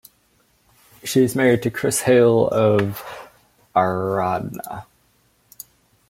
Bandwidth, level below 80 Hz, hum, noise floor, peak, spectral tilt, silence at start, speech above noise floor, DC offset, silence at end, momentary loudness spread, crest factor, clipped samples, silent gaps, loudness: 16.5 kHz; -58 dBFS; none; -61 dBFS; -4 dBFS; -5.5 dB/octave; 1.05 s; 43 dB; under 0.1%; 1.25 s; 23 LU; 18 dB; under 0.1%; none; -19 LUFS